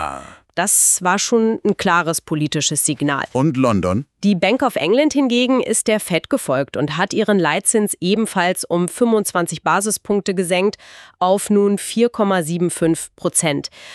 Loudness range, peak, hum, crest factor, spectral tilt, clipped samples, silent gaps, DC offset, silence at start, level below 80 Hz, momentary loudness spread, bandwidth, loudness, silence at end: 2 LU; -2 dBFS; none; 14 dB; -4 dB/octave; under 0.1%; none; under 0.1%; 0 s; -54 dBFS; 5 LU; 14 kHz; -17 LUFS; 0 s